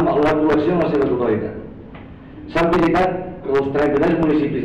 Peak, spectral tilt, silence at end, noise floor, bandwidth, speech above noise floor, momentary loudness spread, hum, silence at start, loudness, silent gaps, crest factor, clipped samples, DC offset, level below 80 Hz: -12 dBFS; -8 dB/octave; 0 s; -37 dBFS; 8.6 kHz; 20 dB; 21 LU; none; 0 s; -18 LUFS; none; 6 dB; under 0.1%; under 0.1%; -40 dBFS